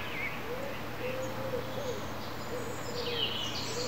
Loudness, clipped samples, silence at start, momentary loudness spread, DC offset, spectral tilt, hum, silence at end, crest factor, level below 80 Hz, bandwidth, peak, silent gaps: -36 LUFS; under 0.1%; 0 s; 7 LU; 0.9%; -3.5 dB/octave; none; 0 s; 18 dB; -58 dBFS; 16 kHz; -18 dBFS; none